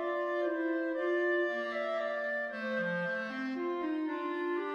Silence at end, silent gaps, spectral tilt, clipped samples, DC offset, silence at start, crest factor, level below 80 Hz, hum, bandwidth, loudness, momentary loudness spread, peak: 0 s; none; -6.5 dB/octave; under 0.1%; under 0.1%; 0 s; 12 dB; -82 dBFS; none; 6.8 kHz; -34 LUFS; 5 LU; -22 dBFS